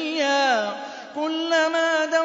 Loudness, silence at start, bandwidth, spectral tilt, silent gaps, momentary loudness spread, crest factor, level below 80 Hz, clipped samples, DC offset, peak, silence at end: -22 LUFS; 0 s; 7.8 kHz; -1.5 dB/octave; none; 10 LU; 14 dB; -80 dBFS; under 0.1%; under 0.1%; -10 dBFS; 0 s